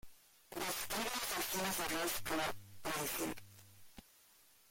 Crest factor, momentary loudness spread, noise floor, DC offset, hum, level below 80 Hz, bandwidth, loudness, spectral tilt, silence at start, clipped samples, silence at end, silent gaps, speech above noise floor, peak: 16 dB; 23 LU; -67 dBFS; under 0.1%; none; -64 dBFS; 17 kHz; -39 LUFS; -2 dB/octave; 0.05 s; under 0.1%; 0.7 s; none; 28 dB; -26 dBFS